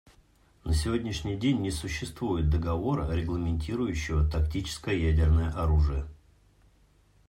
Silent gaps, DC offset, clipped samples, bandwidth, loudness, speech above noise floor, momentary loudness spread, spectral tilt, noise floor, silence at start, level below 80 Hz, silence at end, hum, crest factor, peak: none; under 0.1%; under 0.1%; 13 kHz; -29 LUFS; 35 dB; 8 LU; -6.5 dB/octave; -62 dBFS; 0.65 s; -34 dBFS; 1.15 s; none; 14 dB; -14 dBFS